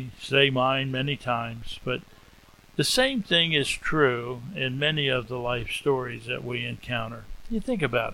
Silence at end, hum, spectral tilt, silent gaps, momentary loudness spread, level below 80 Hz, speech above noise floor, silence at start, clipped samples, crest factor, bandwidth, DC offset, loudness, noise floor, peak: 0 s; none; -4.5 dB/octave; none; 12 LU; -46 dBFS; 27 dB; 0 s; under 0.1%; 22 dB; 16.5 kHz; under 0.1%; -26 LUFS; -53 dBFS; -4 dBFS